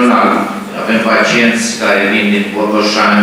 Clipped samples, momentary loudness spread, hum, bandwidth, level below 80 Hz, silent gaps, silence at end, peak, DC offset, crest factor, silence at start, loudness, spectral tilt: under 0.1%; 6 LU; none; 15.5 kHz; -54 dBFS; none; 0 s; 0 dBFS; under 0.1%; 10 dB; 0 s; -11 LUFS; -4 dB/octave